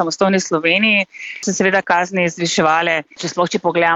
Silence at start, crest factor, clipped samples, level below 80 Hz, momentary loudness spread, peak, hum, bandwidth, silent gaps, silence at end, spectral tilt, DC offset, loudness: 0 s; 14 dB; under 0.1%; -60 dBFS; 8 LU; -2 dBFS; none; 8.2 kHz; none; 0 s; -3.5 dB/octave; under 0.1%; -16 LUFS